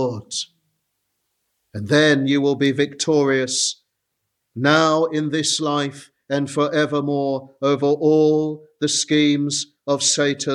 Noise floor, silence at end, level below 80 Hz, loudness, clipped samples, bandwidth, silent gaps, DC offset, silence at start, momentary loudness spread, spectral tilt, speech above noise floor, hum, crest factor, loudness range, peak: -76 dBFS; 0 s; -66 dBFS; -19 LUFS; under 0.1%; 12 kHz; none; under 0.1%; 0 s; 11 LU; -4 dB/octave; 57 dB; none; 18 dB; 2 LU; -2 dBFS